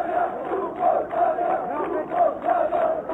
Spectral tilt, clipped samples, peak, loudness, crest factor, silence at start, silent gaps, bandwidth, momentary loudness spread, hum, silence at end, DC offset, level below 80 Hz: -7.5 dB/octave; under 0.1%; -10 dBFS; -24 LUFS; 14 dB; 0 s; none; 4 kHz; 5 LU; none; 0 s; under 0.1%; -58 dBFS